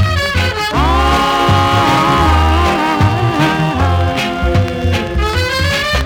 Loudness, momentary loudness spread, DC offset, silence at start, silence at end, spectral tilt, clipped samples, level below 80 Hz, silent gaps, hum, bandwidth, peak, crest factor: -13 LUFS; 5 LU; under 0.1%; 0 s; 0 s; -5.5 dB/octave; under 0.1%; -20 dBFS; none; none; 17.5 kHz; -2 dBFS; 10 dB